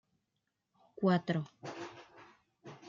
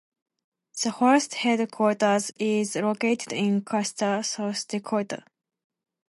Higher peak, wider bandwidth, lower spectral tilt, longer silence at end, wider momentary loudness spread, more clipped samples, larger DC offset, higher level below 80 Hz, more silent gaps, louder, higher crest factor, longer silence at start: second, -18 dBFS vs -8 dBFS; second, 7.4 kHz vs 11.5 kHz; first, -7.5 dB/octave vs -4 dB/octave; second, 0 s vs 0.95 s; first, 24 LU vs 8 LU; neither; neither; about the same, -80 dBFS vs -76 dBFS; neither; second, -35 LUFS vs -25 LUFS; about the same, 20 dB vs 18 dB; first, 1 s vs 0.75 s